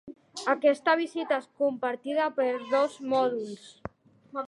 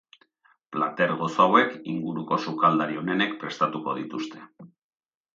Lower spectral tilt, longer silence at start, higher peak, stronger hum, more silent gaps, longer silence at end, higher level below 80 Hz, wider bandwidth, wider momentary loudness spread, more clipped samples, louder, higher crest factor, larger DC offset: second, -4.5 dB/octave vs -6 dB/octave; second, 0.05 s vs 0.7 s; second, -10 dBFS vs -4 dBFS; neither; neither; second, 0 s vs 0.65 s; first, -68 dBFS vs -74 dBFS; first, 11.5 kHz vs 7.6 kHz; first, 18 LU vs 14 LU; neither; second, -28 LUFS vs -25 LUFS; about the same, 18 dB vs 22 dB; neither